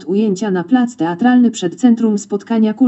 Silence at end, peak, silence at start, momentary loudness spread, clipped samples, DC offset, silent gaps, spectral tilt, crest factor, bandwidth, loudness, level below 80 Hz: 0 s; 0 dBFS; 0 s; 6 LU; under 0.1%; under 0.1%; none; -6 dB/octave; 12 dB; 8.2 kHz; -15 LUFS; -70 dBFS